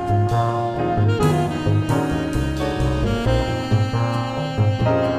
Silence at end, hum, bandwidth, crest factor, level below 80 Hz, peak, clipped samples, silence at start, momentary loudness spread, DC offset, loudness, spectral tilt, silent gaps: 0 s; none; 14 kHz; 14 dB; -32 dBFS; -4 dBFS; under 0.1%; 0 s; 4 LU; under 0.1%; -20 LUFS; -7 dB/octave; none